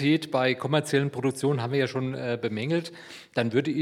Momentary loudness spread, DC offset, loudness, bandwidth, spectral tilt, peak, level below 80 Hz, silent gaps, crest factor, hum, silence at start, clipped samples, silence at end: 6 LU; under 0.1%; -27 LUFS; 14.5 kHz; -6 dB/octave; -8 dBFS; -76 dBFS; none; 18 dB; none; 0 s; under 0.1%; 0 s